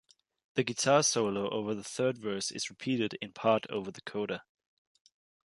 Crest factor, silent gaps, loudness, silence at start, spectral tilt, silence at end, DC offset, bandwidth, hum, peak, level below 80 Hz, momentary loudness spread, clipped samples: 20 dB; none; -32 LUFS; 0.55 s; -3.5 dB/octave; 1.1 s; under 0.1%; 11.5 kHz; none; -12 dBFS; -74 dBFS; 12 LU; under 0.1%